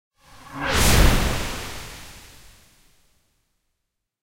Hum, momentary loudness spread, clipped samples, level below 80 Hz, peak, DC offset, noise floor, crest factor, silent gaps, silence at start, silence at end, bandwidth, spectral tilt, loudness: none; 24 LU; under 0.1%; -28 dBFS; -4 dBFS; under 0.1%; -79 dBFS; 20 dB; none; 0.5 s; 1.75 s; 16 kHz; -3.5 dB/octave; -21 LUFS